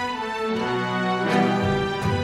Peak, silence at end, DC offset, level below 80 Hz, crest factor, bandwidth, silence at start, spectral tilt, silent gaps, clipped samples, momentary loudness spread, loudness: -8 dBFS; 0 s; under 0.1%; -48 dBFS; 16 dB; 13.5 kHz; 0 s; -6 dB/octave; none; under 0.1%; 5 LU; -23 LUFS